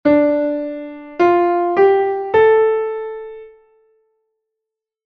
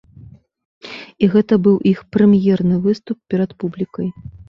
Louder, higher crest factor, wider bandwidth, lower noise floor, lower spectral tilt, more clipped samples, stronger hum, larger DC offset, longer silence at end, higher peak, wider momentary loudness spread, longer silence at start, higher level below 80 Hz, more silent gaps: about the same, -15 LUFS vs -17 LUFS; about the same, 16 dB vs 16 dB; about the same, 6.2 kHz vs 6 kHz; first, -83 dBFS vs -43 dBFS; second, -7.5 dB/octave vs -9.5 dB/octave; neither; neither; neither; first, 1.6 s vs 0.05 s; about the same, -2 dBFS vs -2 dBFS; first, 17 LU vs 13 LU; second, 0.05 s vs 0.85 s; second, -56 dBFS vs -50 dBFS; neither